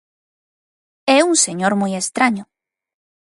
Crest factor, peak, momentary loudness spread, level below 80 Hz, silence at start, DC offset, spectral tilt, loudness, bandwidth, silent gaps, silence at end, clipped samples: 20 dB; 0 dBFS; 9 LU; -68 dBFS; 1.05 s; under 0.1%; -3 dB/octave; -16 LUFS; 11.5 kHz; none; 0.8 s; under 0.1%